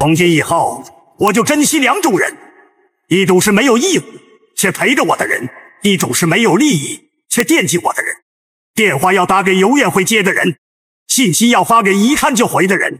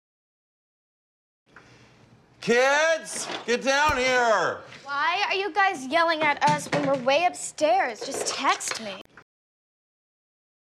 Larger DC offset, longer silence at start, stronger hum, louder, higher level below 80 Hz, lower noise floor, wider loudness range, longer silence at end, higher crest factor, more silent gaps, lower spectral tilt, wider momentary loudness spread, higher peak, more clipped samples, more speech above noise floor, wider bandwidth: neither; second, 0 s vs 1.55 s; neither; first, -12 LUFS vs -24 LUFS; about the same, -52 dBFS vs -56 dBFS; second, -52 dBFS vs -56 dBFS; about the same, 2 LU vs 4 LU; second, 0 s vs 1.6 s; about the same, 14 dB vs 14 dB; first, 8.22-8.74 s, 10.58-11.06 s vs 9.01-9.05 s; about the same, -3.5 dB/octave vs -2.5 dB/octave; about the same, 9 LU vs 10 LU; first, 0 dBFS vs -12 dBFS; neither; first, 40 dB vs 31 dB; first, 16 kHz vs 14.5 kHz